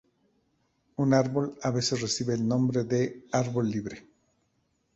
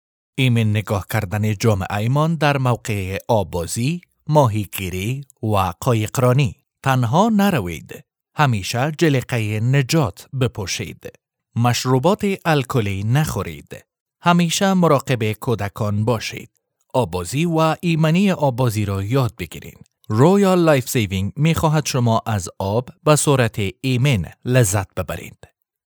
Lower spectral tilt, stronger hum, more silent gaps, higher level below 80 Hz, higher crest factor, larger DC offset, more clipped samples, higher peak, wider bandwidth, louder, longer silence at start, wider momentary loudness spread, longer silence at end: about the same, -5.5 dB/octave vs -5.5 dB/octave; neither; second, none vs 14.00-14.06 s; second, -62 dBFS vs -50 dBFS; about the same, 20 dB vs 18 dB; neither; neither; second, -10 dBFS vs 0 dBFS; second, 8.2 kHz vs over 20 kHz; second, -28 LUFS vs -19 LUFS; first, 1 s vs 0.35 s; about the same, 9 LU vs 10 LU; first, 0.95 s vs 0.55 s